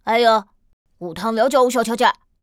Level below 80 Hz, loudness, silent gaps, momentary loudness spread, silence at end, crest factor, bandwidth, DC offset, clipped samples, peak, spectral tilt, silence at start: -58 dBFS; -18 LUFS; 0.73-0.85 s; 12 LU; 0.3 s; 16 dB; 16.5 kHz; under 0.1%; under 0.1%; -2 dBFS; -3.5 dB/octave; 0.05 s